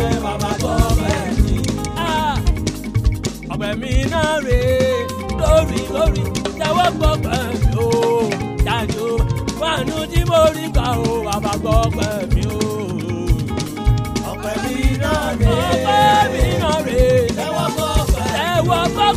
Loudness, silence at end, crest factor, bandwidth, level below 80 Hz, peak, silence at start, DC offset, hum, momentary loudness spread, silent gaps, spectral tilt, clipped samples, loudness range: -18 LUFS; 0 s; 16 dB; 15.5 kHz; -24 dBFS; 0 dBFS; 0 s; under 0.1%; none; 7 LU; none; -5.5 dB/octave; under 0.1%; 4 LU